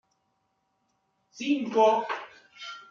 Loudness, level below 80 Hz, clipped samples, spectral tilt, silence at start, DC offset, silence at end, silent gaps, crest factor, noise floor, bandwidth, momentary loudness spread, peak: -26 LUFS; -82 dBFS; under 0.1%; -4.5 dB/octave; 1.35 s; under 0.1%; 0.05 s; none; 20 dB; -75 dBFS; 7.4 kHz; 20 LU; -10 dBFS